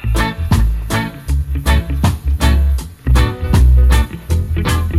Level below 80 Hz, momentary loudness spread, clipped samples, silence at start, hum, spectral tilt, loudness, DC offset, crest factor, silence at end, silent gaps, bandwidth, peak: -14 dBFS; 8 LU; under 0.1%; 0 s; none; -6 dB/octave; -16 LUFS; under 0.1%; 10 dB; 0 s; none; 14.5 kHz; -2 dBFS